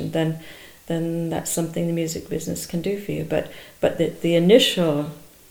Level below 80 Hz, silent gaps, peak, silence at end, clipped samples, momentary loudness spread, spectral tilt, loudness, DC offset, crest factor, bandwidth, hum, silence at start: -52 dBFS; none; -2 dBFS; 0.25 s; under 0.1%; 14 LU; -5 dB/octave; -22 LUFS; under 0.1%; 22 dB; over 20 kHz; none; 0 s